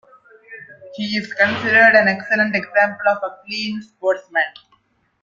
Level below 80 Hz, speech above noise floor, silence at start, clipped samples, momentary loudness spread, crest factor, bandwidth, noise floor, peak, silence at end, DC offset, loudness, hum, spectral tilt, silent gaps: -64 dBFS; 43 dB; 0.5 s; under 0.1%; 15 LU; 18 dB; 7.4 kHz; -61 dBFS; -2 dBFS; 0.7 s; under 0.1%; -17 LUFS; none; -5 dB/octave; none